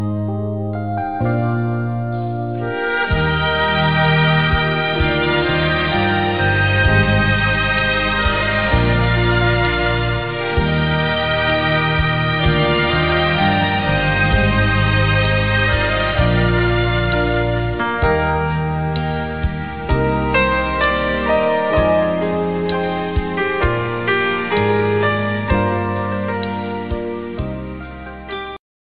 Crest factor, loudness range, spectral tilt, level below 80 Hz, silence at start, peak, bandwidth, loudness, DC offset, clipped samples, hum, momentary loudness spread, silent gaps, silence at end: 16 dB; 4 LU; -8.5 dB/octave; -28 dBFS; 0 s; -2 dBFS; 5 kHz; -17 LUFS; 0.9%; under 0.1%; none; 8 LU; none; 0.4 s